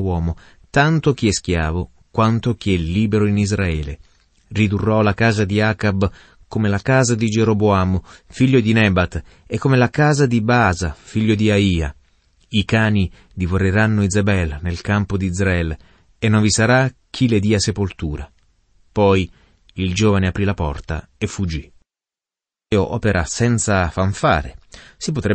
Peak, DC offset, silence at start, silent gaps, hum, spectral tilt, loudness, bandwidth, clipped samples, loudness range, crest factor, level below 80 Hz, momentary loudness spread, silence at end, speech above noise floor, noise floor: -2 dBFS; under 0.1%; 0 s; none; none; -5.5 dB/octave; -18 LUFS; 8.8 kHz; under 0.1%; 4 LU; 16 dB; -36 dBFS; 11 LU; 0 s; 72 dB; -90 dBFS